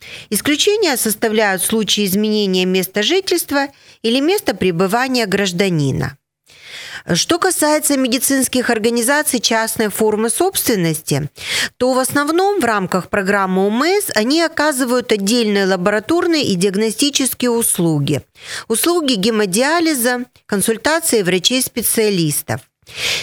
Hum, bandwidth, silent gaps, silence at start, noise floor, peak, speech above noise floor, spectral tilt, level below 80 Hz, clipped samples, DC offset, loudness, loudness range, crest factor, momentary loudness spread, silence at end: none; 20 kHz; none; 0 s; -43 dBFS; 0 dBFS; 27 dB; -3.5 dB/octave; -54 dBFS; under 0.1%; under 0.1%; -15 LUFS; 2 LU; 16 dB; 6 LU; 0 s